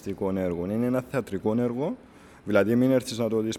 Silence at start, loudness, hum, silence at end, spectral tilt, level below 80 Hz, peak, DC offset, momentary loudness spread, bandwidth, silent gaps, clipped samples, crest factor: 0.05 s; -26 LUFS; none; 0 s; -6.5 dB/octave; -60 dBFS; -8 dBFS; under 0.1%; 9 LU; 14.5 kHz; none; under 0.1%; 18 dB